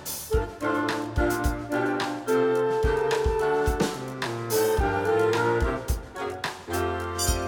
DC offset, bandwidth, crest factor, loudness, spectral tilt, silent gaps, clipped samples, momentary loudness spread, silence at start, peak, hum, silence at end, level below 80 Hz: under 0.1%; 19 kHz; 14 dB; -26 LUFS; -5 dB/octave; none; under 0.1%; 8 LU; 0 s; -12 dBFS; none; 0 s; -34 dBFS